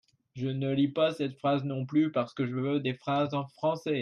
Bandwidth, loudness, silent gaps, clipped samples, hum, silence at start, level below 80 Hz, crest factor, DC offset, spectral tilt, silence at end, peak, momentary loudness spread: 10.5 kHz; -30 LUFS; none; under 0.1%; none; 0.35 s; -72 dBFS; 14 dB; under 0.1%; -8 dB/octave; 0 s; -14 dBFS; 5 LU